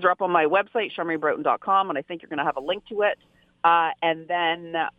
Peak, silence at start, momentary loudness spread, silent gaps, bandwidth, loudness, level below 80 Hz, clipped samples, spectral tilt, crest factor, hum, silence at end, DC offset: -6 dBFS; 0 s; 8 LU; none; 4.9 kHz; -24 LUFS; -68 dBFS; under 0.1%; -6.5 dB/octave; 18 dB; none; 0.1 s; under 0.1%